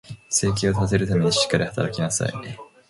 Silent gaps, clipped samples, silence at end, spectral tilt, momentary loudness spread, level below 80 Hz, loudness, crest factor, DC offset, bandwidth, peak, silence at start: none; under 0.1%; 0.25 s; -4 dB/octave; 8 LU; -44 dBFS; -22 LUFS; 18 dB; under 0.1%; 11.5 kHz; -4 dBFS; 0.1 s